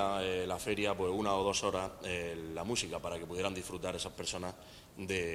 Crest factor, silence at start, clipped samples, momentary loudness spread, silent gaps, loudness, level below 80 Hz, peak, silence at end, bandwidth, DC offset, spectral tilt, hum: 18 dB; 0 s; under 0.1%; 8 LU; none; -36 LUFS; -60 dBFS; -18 dBFS; 0 s; 16 kHz; under 0.1%; -3.5 dB/octave; none